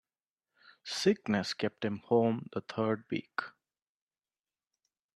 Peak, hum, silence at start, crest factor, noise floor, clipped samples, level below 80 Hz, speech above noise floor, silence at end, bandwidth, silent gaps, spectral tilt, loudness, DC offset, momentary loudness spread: -14 dBFS; none; 0.85 s; 22 dB; under -90 dBFS; under 0.1%; -76 dBFS; over 58 dB; 1.65 s; 12.5 kHz; none; -5.5 dB/octave; -33 LUFS; under 0.1%; 11 LU